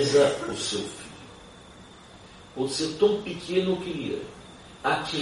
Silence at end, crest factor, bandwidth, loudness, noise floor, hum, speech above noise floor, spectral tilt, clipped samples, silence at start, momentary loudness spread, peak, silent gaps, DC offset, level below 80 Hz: 0 s; 18 dB; 11.5 kHz; -27 LUFS; -48 dBFS; none; 22 dB; -4 dB/octave; under 0.1%; 0 s; 24 LU; -10 dBFS; none; under 0.1%; -58 dBFS